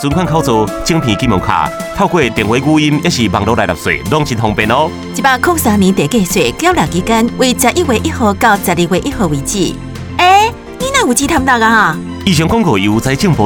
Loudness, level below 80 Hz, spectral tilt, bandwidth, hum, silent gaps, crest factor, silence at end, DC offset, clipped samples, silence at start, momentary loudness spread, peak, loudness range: -12 LUFS; -32 dBFS; -4.5 dB/octave; over 20 kHz; none; none; 12 dB; 0 s; under 0.1%; 0.1%; 0 s; 5 LU; 0 dBFS; 1 LU